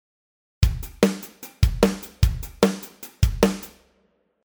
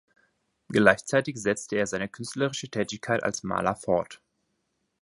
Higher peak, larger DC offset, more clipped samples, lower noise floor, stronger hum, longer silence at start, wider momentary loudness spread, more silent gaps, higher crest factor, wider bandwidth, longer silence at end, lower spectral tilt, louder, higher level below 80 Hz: about the same, -2 dBFS vs -2 dBFS; neither; neither; second, -66 dBFS vs -76 dBFS; neither; about the same, 0.6 s vs 0.7 s; first, 14 LU vs 10 LU; neither; about the same, 22 dB vs 26 dB; first, over 20 kHz vs 11.5 kHz; second, 0.75 s vs 0.9 s; first, -6 dB/octave vs -4.5 dB/octave; first, -23 LUFS vs -27 LUFS; first, -28 dBFS vs -60 dBFS